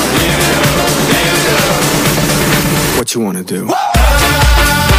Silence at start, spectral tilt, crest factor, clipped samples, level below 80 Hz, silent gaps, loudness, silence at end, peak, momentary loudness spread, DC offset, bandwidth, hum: 0 s; -3.5 dB/octave; 10 dB; under 0.1%; -18 dBFS; none; -11 LUFS; 0 s; 0 dBFS; 6 LU; under 0.1%; 16 kHz; none